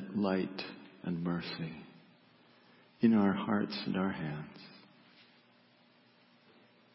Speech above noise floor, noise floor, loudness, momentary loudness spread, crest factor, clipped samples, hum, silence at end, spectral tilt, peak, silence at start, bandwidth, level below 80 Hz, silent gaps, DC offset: 32 dB; -65 dBFS; -34 LUFS; 21 LU; 22 dB; under 0.1%; 60 Hz at -65 dBFS; 2.15 s; -5.5 dB/octave; -16 dBFS; 0 s; 5.6 kHz; -70 dBFS; none; under 0.1%